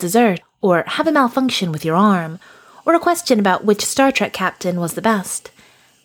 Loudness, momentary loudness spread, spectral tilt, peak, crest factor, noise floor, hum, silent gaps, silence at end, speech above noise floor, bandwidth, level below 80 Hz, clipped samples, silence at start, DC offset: -17 LUFS; 7 LU; -4.5 dB/octave; -2 dBFS; 16 dB; -51 dBFS; none; none; 0.65 s; 34 dB; 19.5 kHz; -60 dBFS; under 0.1%; 0 s; under 0.1%